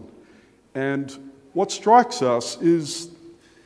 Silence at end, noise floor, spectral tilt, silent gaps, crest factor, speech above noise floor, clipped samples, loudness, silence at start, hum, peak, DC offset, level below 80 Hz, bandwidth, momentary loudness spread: 0.35 s; -54 dBFS; -4.5 dB/octave; none; 22 dB; 33 dB; under 0.1%; -21 LUFS; 0 s; none; -2 dBFS; under 0.1%; -68 dBFS; 11 kHz; 19 LU